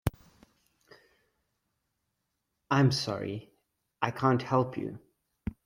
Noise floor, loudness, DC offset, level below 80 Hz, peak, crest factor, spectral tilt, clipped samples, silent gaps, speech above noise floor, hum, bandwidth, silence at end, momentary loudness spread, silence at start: -82 dBFS; -30 LUFS; under 0.1%; -54 dBFS; -10 dBFS; 24 dB; -6.5 dB/octave; under 0.1%; none; 54 dB; none; 16 kHz; 0.15 s; 16 LU; 0.05 s